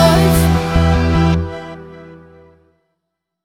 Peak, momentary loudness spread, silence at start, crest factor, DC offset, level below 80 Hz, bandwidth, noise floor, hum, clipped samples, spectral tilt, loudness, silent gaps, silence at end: 0 dBFS; 21 LU; 0 s; 16 dB; under 0.1%; -24 dBFS; 17 kHz; -76 dBFS; none; under 0.1%; -6 dB/octave; -14 LUFS; none; 1.3 s